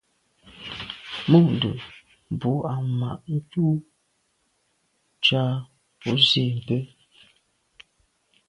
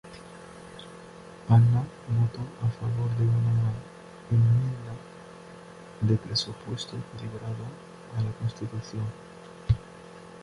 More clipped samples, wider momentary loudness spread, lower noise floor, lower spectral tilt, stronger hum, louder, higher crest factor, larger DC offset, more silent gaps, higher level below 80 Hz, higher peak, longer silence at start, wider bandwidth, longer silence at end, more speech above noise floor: neither; second, 17 LU vs 23 LU; first, -70 dBFS vs -46 dBFS; about the same, -6.5 dB/octave vs -7 dB/octave; neither; first, -23 LUFS vs -28 LUFS; about the same, 22 dB vs 18 dB; neither; neither; second, -60 dBFS vs -50 dBFS; first, -2 dBFS vs -10 dBFS; first, 0.55 s vs 0.05 s; about the same, 10.5 kHz vs 11 kHz; first, 1.65 s vs 0 s; first, 48 dB vs 20 dB